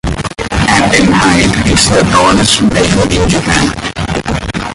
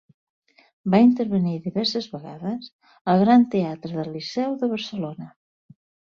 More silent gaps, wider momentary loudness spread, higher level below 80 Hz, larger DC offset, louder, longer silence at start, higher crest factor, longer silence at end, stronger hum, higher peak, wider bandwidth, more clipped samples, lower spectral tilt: second, none vs 2.73-2.79 s, 3.01-3.05 s; second, 9 LU vs 16 LU; first, -24 dBFS vs -64 dBFS; neither; first, -9 LUFS vs -22 LUFS; second, 0.05 s vs 0.85 s; second, 10 dB vs 20 dB; second, 0 s vs 0.85 s; neither; first, 0 dBFS vs -4 dBFS; first, 11.5 kHz vs 7 kHz; neither; second, -4 dB/octave vs -7 dB/octave